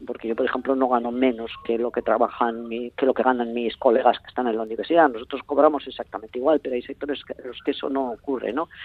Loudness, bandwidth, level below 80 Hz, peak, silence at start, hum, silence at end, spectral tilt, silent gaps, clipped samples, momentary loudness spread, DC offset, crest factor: -23 LUFS; 4.7 kHz; -58 dBFS; -2 dBFS; 0 s; none; 0 s; -7.5 dB/octave; none; under 0.1%; 11 LU; under 0.1%; 20 dB